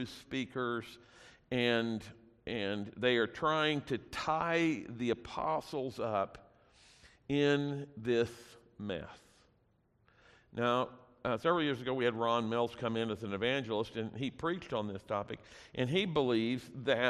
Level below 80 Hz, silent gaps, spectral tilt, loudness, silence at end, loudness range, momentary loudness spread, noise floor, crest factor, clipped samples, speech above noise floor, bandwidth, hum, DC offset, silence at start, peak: -66 dBFS; none; -6 dB/octave; -35 LUFS; 0 s; 4 LU; 11 LU; -72 dBFS; 20 dB; under 0.1%; 38 dB; 13.5 kHz; none; under 0.1%; 0 s; -16 dBFS